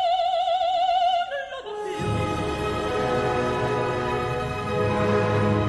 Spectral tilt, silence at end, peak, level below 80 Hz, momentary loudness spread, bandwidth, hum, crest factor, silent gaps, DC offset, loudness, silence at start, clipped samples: -6 dB/octave; 0 s; -10 dBFS; -42 dBFS; 7 LU; 12 kHz; none; 14 dB; none; under 0.1%; -24 LUFS; 0 s; under 0.1%